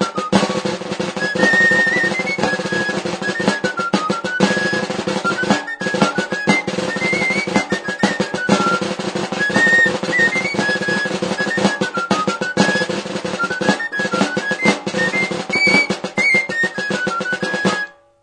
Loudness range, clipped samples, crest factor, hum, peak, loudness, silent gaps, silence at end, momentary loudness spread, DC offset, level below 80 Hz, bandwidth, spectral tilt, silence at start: 2 LU; under 0.1%; 18 dB; none; 0 dBFS; -17 LUFS; none; 0.3 s; 8 LU; under 0.1%; -56 dBFS; 10.5 kHz; -4 dB/octave; 0 s